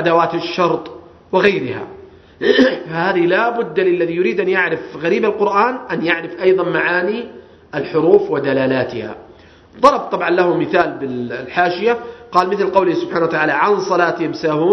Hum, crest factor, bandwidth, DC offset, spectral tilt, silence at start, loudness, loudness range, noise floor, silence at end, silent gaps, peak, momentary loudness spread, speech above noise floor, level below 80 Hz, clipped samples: none; 16 dB; 6.4 kHz; under 0.1%; -6 dB/octave; 0 s; -16 LUFS; 1 LU; -43 dBFS; 0 s; none; 0 dBFS; 10 LU; 28 dB; -56 dBFS; under 0.1%